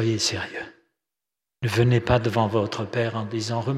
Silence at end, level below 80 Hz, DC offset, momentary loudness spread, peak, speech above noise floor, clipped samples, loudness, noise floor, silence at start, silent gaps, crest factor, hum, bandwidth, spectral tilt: 0 s; -48 dBFS; under 0.1%; 11 LU; -4 dBFS; 65 dB; under 0.1%; -24 LUFS; -88 dBFS; 0 s; none; 20 dB; none; 13.5 kHz; -5.5 dB/octave